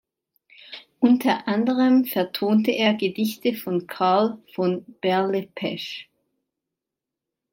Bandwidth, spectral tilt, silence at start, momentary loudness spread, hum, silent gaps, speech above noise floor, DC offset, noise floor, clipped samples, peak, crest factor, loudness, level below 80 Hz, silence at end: 16.5 kHz; -6 dB/octave; 0.7 s; 12 LU; none; none; 65 dB; under 0.1%; -86 dBFS; under 0.1%; -6 dBFS; 18 dB; -22 LUFS; -74 dBFS; 1.5 s